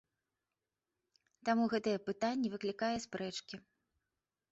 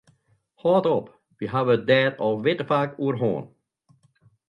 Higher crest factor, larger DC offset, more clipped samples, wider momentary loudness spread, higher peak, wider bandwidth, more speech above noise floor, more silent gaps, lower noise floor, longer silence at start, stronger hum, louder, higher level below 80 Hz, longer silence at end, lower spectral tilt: about the same, 18 dB vs 20 dB; neither; neither; first, 11 LU vs 8 LU; second, -22 dBFS vs -6 dBFS; second, 8 kHz vs 9.4 kHz; first, over 53 dB vs 42 dB; neither; first, under -90 dBFS vs -64 dBFS; first, 1.45 s vs 0.65 s; neither; second, -37 LUFS vs -23 LUFS; second, -76 dBFS vs -66 dBFS; about the same, 0.95 s vs 1.05 s; second, -4 dB/octave vs -8 dB/octave